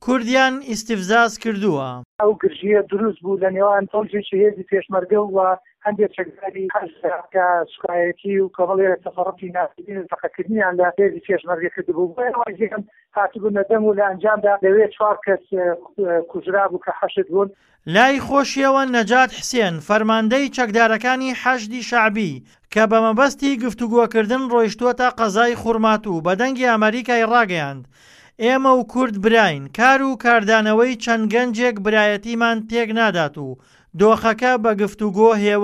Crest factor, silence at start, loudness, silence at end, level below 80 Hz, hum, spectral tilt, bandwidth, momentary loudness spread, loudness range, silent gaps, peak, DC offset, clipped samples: 16 dB; 0.05 s; -18 LUFS; 0 s; -56 dBFS; none; -5 dB/octave; 13 kHz; 9 LU; 4 LU; 2.05-2.19 s; -2 dBFS; under 0.1%; under 0.1%